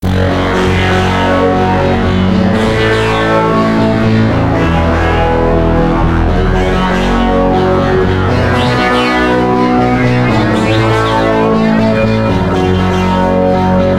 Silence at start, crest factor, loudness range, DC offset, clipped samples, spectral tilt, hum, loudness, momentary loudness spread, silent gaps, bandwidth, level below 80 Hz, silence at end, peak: 0 s; 10 dB; 1 LU; 1%; under 0.1%; -7 dB/octave; none; -11 LUFS; 2 LU; none; 13 kHz; -22 dBFS; 0 s; 0 dBFS